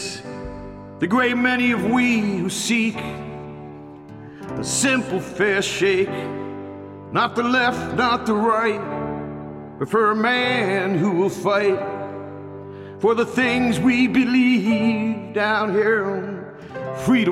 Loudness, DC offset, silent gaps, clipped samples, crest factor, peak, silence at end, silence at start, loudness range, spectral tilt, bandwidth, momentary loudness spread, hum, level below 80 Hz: -20 LUFS; under 0.1%; none; under 0.1%; 16 dB; -4 dBFS; 0 s; 0 s; 4 LU; -4.5 dB/octave; 14.5 kHz; 17 LU; none; -52 dBFS